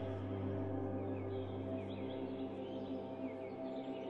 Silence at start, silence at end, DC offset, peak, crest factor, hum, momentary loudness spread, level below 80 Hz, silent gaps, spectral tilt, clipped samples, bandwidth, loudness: 0 s; 0 s; under 0.1%; -30 dBFS; 12 dB; none; 4 LU; -70 dBFS; none; -9.5 dB/octave; under 0.1%; 5.6 kHz; -43 LUFS